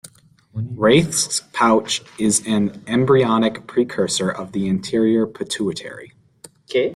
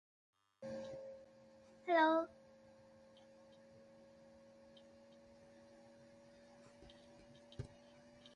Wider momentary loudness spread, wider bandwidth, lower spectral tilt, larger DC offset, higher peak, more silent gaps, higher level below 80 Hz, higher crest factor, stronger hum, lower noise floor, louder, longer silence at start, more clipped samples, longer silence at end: second, 10 LU vs 27 LU; first, 14.5 kHz vs 10.5 kHz; second, -4.5 dB/octave vs -6 dB/octave; neither; first, -2 dBFS vs -20 dBFS; neither; first, -54 dBFS vs -76 dBFS; second, 16 dB vs 26 dB; neither; second, -51 dBFS vs -64 dBFS; first, -19 LUFS vs -40 LUFS; second, 0.05 s vs 0.6 s; neither; about the same, 0 s vs 0.05 s